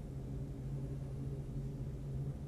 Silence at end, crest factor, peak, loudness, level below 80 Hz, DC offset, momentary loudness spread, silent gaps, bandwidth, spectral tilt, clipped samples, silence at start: 0 s; 12 dB; -30 dBFS; -44 LUFS; -48 dBFS; under 0.1%; 2 LU; none; 11.5 kHz; -9 dB/octave; under 0.1%; 0 s